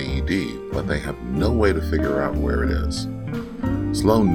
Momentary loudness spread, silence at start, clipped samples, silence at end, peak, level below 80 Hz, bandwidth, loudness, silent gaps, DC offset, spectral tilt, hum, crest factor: 9 LU; 0 s; under 0.1%; 0 s; -2 dBFS; -28 dBFS; 16 kHz; -23 LUFS; none; under 0.1%; -6.5 dB/octave; none; 20 dB